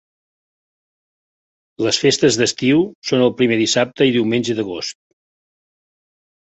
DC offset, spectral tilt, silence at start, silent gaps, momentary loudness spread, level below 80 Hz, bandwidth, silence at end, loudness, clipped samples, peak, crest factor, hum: under 0.1%; -4 dB/octave; 1.8 s; 2.95-3.02 s; 8 LU; -58 dBFS; 8.4 kHz; 1.6 s; -17 LUFS; under 0.1%; -2 dBFS; 18 dB; none